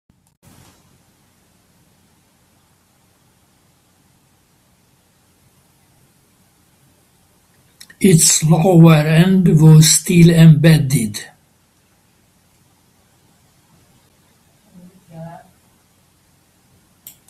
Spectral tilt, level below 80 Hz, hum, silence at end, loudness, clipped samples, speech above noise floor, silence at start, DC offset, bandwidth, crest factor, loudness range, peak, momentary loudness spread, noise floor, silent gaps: -5.5 dB/octave; -48 dBFS; none; 2 s; -10 LUFS; under 0.1%; 47 dB; 8 s; under 0.1%; 15 kHz; 16 dB; 11 LU; 0 dBFS; 23 LU; -57 dBFS; none